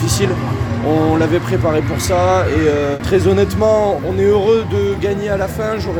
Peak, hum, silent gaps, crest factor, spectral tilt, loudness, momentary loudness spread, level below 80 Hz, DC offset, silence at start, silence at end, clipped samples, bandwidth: -2 dBFS; none; none; 12 dB; -6 dB/octave; -15 LUFS; 5 LU; -34 dBFS; under 0.1%; 0 s; 0 s; under 0.1%; over 20 kHz